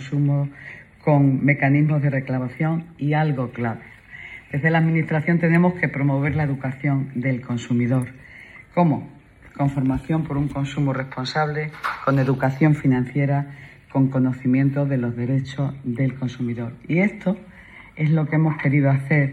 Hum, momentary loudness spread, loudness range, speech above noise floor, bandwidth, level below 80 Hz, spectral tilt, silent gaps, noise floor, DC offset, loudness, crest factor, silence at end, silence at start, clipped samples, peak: none; 11 LU; 3 LU; 23 dB; 7.8 kHz; -50 dBFS; -8.5 dB/octave; none; -44 dBFS; under 0.1%; -22 LUFS; 18 dB; 0 s; 0 s; under 0.1%; -4 dBFS